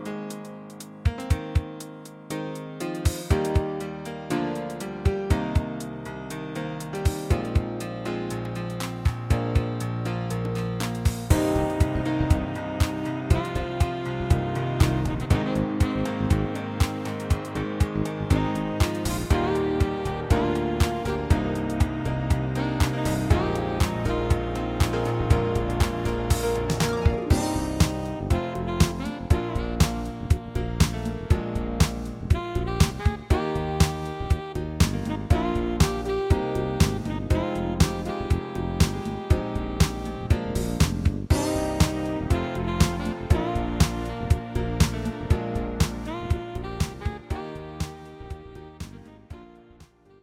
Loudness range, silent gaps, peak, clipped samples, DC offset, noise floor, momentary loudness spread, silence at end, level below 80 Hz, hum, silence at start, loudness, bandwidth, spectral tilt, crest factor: 4 LU; none; -4 dBFS; under 0.1%; under 0.1%; -53 dBFS; 9 LU; 0.4 s; -32 dBFS; none; 0 s; -26 LUFS; 16.5 kHz; -6 dB/octave; 22 dB